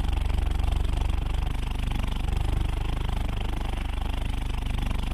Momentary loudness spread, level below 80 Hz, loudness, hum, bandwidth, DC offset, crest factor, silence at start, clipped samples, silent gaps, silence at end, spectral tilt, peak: 3 LU; -26 dBFS; -30 LUFS; none; 15 kHz; under 0.1%; 12 dB; 0 s; under 0.1%; none; 0 s; -6 dB/octave; -14 dBFS